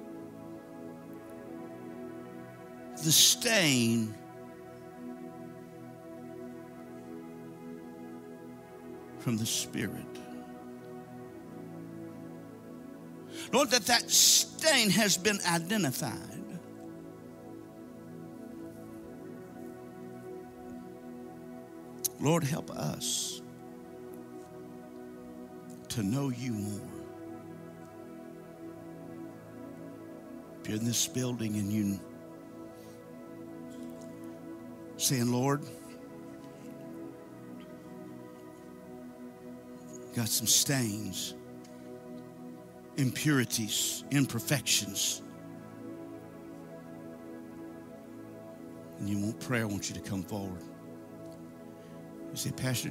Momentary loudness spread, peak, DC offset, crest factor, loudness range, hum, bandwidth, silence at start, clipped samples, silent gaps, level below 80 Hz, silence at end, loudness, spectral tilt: 22 LU; -8 dBFS; under 0.1%; 26 dB; 19 LU; none; 16 kHz; 0 s; under 0.1%; none; -70 dBFS; 0 s; -29 LUFS; -3 dB/octave